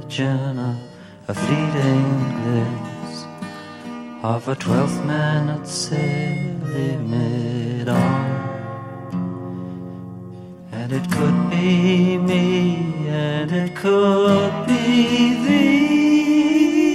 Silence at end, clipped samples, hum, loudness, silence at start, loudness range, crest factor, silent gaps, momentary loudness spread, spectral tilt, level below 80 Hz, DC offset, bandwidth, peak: 0 s; under 0.1%; none; -19 LUFS; 0 s; 7 LU; 16 dB; none; 17 LU; -6.5 dB/octave; -58 dBFS; under 0.1%; 12.5 kHz; -4 dBFS